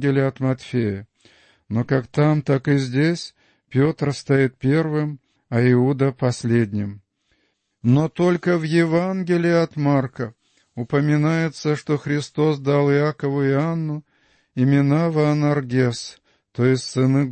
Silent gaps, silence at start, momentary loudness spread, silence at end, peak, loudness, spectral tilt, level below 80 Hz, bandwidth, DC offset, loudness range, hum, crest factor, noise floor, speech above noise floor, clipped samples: none; 0 s; 11 LU; 0 s; -6 dBFS; -20 LUFS; -7.5 dB/octave; -58 dBFS; 8.8 kHz; under 0.1%; 2 LU; none; 14 dB; -68 dBFS; 49 dB; under 0.1%